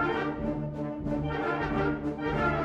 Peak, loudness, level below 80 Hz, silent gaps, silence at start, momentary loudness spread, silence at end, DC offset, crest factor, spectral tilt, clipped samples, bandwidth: -16 dBFS; -31 LUFS; -44 dBFS; none; 0 s; 5 LU; 0 s; under 0.1%; 14 dB; -8 dB/octave; under 0.1%; 7.8 kHz